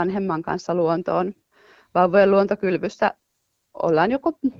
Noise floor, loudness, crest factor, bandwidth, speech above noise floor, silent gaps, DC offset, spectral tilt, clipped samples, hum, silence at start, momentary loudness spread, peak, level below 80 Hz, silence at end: -73 dBFS; -21 LUFS; 18 dB; 7.6 kHz; 53 dB; none; under 0.1%; -7.5 dB/octave; under 0.1%; none; 0 s; 9 LU; -4 dBFS; -58 dBFS; 0.1 s